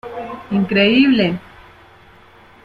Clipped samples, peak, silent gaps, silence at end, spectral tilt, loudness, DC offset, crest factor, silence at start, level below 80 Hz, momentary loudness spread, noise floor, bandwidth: under 0.1%; -2 dBFS; none; 1.25 s; -7.5 dB/octave; -15 LUFS; under 0.1%; 16 dB; 0.05 s; -52 dBFS; 17 LU; -46 dBFS; 5.2 kHz